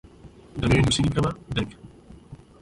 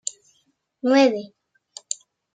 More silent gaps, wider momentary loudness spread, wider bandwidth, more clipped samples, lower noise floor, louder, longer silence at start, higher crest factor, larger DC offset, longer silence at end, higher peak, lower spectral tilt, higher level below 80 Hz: neither; second, 13 LU vs 26 LU; first, 11.5 kHz vs 9.6 kHz; neither; second, -48 dBFS vs -68 dBFS; about the same, -24 LUFS vs -22 LUFS; second, 0.25 s vs 0.85 s; about the same, 16 dB vs 20 dB; neither; second, 0.25 s vs 0.4 s; second, -10 dBFS vs -6 dBFS; first, -5.5 dB/octave vs -2.5 dB/octave; first, -40 dBFS vs -80 dBFS